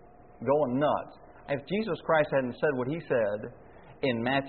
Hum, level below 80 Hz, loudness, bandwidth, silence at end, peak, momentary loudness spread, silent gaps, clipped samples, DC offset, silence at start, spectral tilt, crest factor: none; -62 dBFS; -29 LUFS; 4.5 kHz; 0 s; -12 dBFS; 10 LU; none; under 0.1%; 0.1%; 0.4 s; -4.5 dB/octave; 18 dB